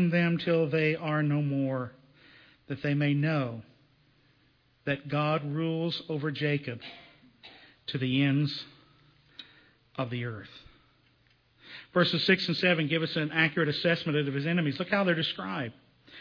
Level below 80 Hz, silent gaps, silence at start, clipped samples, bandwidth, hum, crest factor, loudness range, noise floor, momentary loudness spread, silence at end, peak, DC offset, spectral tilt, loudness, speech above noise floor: -70 dBFS; none; 0 s; under 0.1%; 5.4 kHz; none; 20 dB; 7 LU; -66 dBFS; 17 LU; 0 s; -10 dBFS; under 0.1%; -7.5 dB/octave; -29 LUFS; 38 dB